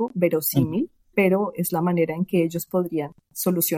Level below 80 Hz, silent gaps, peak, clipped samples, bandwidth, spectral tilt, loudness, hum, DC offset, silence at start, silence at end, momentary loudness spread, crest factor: -58 dBFS; none; -8 dBFS; under 0.1%; 17 kHz; -6 dB/octave; -23 LUFS; none; under 0.1%; 0 s; 0 s; 7 LU; 16 dB